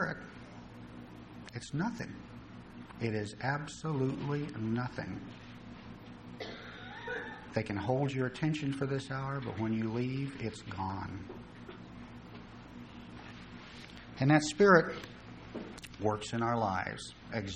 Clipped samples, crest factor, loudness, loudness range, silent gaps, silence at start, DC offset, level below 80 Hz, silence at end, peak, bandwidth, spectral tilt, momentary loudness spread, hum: under 0.1%; 26 dB; -34 LUFS; 11 LU; none; 0 s; under 0.1%; -60 dBFS; 0 s; -10 dBFS; 10.5 kHz; -6 dB/octave; 18 LU; none